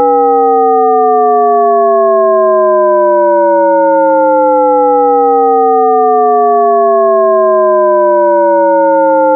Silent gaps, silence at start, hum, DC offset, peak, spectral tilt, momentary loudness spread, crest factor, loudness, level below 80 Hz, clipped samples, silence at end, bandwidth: none; 0 s; none; under 0.1%; 0 dBFS; -12.5 dB/octave; 0 LU; 8 dB; -8 LUFS; -86 dBFS; under 0.1%; 0 s; 2.5 kHz